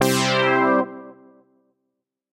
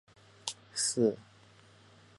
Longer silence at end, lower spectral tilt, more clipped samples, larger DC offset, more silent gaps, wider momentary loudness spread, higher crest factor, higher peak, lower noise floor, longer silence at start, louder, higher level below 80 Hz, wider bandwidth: first, 1.2 s vs 0.95 s; about the same, -4 dB/octave vs -3.5 dB/octave; neither; neither; neither; about the same, 14 LU vs 13 LU; second, 18 dB vs 24 dB; first, -4 dBFS vs -12 dBFS; first, -79 dBFS vs -60 dBFS; second, 0 s vs 0.45 s; first, -19 LUFS vs -33 LUFS; first, -68 dBFS vs -74 dBFS; first, 16 kHz vs 11.5 kHz